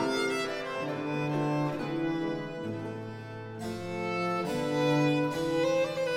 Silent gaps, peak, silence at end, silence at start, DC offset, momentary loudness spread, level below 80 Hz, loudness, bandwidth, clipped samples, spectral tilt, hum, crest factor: none; -16 dBFS; 0 s; 0 s; under 0.1%; 11 LU; -64 dBFS; -31 LUFS; 16 kHz; under 0.1%; -6 dB/octave; none; 16 dB